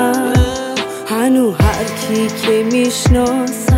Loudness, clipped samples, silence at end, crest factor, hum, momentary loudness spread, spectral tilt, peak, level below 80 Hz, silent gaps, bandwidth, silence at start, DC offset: -15 LUFS; under 0.1%; 0 s; 12 dB; none; 7 LU; -5.5 dB/octave; -2 dBFS; -24 dBFS; none; 16.5 kHz; 0 s; under 0.1%